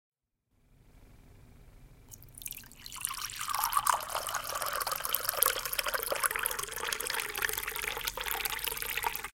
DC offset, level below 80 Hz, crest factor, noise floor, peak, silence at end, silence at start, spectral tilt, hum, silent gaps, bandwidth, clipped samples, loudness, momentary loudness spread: under 0.1%; -56 dBFS; 34 dB; -75 dBFS; 0 dBFS; 0.05 s; 0.95 s; 0.5 dB/octave; none; none; 17 kHz; under 0.1%; -32 LUFS; 14 LU